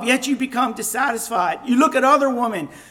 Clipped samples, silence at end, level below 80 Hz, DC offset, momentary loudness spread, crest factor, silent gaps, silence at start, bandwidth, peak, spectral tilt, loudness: under 0.1%; 0.1 s; -62 dBFS; under 0.1%; 7 LU; 16 dB; none; 0 s; 17 kHz; -4 dBFS; -3 dB/octave; -19 LUFS